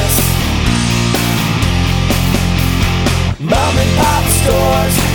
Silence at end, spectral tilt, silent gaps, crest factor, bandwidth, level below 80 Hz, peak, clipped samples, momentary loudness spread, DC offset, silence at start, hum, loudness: 0 s; -4.5 dB/octave; none; 10 dB; over 20 kHz; -20 dBFS; -2 dBFS; under 0.1%; 2 LU; under 0.1%; 0 s; none; -13 LUFS